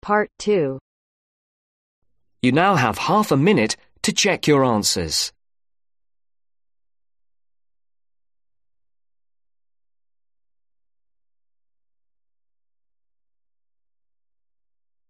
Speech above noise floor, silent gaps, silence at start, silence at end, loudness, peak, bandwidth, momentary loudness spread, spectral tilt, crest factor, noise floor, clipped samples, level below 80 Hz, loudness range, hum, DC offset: over 71 dB; 0.81-2.02 s; 0.05 s; 9.8 s; -19 LUFS; -2 dBFS; 13 kHz; 7 LU; -4 dB/octave; 22 dB; under -90 dBFS; under 0.1%; -56 dBFS; 8 LU; none; under 0.1%